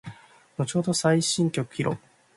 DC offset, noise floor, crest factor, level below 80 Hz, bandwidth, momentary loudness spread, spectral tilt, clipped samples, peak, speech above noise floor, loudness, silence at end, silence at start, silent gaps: under 0.1%; -45 dBFS; 18 dB; -64 dBFS; 11.5 kHz; 16 LU; -4.5 dB/octave; under 0.1%; -8 dBFS; 20 dB; -25 LUFS; 0.4 s; 0.05 s; none